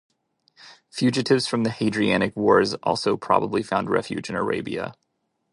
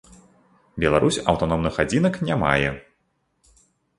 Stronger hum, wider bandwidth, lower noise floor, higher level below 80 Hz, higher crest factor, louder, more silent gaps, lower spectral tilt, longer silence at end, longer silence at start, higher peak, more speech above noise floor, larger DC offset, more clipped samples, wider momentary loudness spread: neither; about the same, 11.5 kHz vs 11.5 kHz; second, -62 dBFS vs -70 dBFS; second, -58 dBFS vs -42 dBFS; about the same, 22 dB vs 22 dB; about the same, -23 LUFS vs -21 LUFS; neither; about the same, -5.5 dB/octave vs -5.5 dB/octave; second, 0.6 s vs 1.2 s; about the same, 0.65 s vs 0.75 s; about the same, -2 dBFS vs -2 dBFS; second, 40 dB vs 49 dB; neither; neither; first, 10 LU vs 7 LU